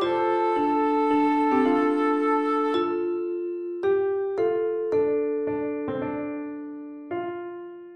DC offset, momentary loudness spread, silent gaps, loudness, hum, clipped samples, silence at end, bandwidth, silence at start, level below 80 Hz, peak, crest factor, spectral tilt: under 0.1%; 12 LU; none; -25 LUFS; none; under 0.1%; 0 s; 8.8 kHz; 0 s; -66 dBFS; -10 dBFS; 14 dB; -7 dB/octave